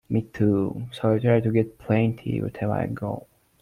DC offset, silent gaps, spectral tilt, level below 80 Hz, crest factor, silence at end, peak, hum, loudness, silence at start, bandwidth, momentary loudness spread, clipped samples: under 0.1%; none; -9.5 dB/octave; -54 dBFS; 16 dB; 0.4 s; -8 dBFS; none; -25 LUFS; 0.1 s; 10.5 kHz; 9 LU; under 0.1%